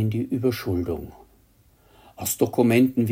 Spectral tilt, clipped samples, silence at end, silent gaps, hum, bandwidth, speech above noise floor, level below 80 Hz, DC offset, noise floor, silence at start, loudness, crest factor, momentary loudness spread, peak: -6 dB/octave; under 0.1%; 0 s; none; none; 16.5 kHz; 36 dB; -54 dBFS; under 0.1%; -58 dBFS; 0 s; -23 LUFS; 18 dB; 13 LU; -6 dBFS